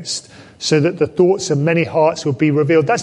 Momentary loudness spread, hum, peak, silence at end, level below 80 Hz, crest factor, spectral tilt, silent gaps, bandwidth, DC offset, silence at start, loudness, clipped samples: 7 LU; none; -2 dBFS; 0 s; -56 dBFS; 14 dB; -5.5 dB/octave; none; 11.5 kHz; under 0.1%; 0 s; -16 LUFS; under 0.1%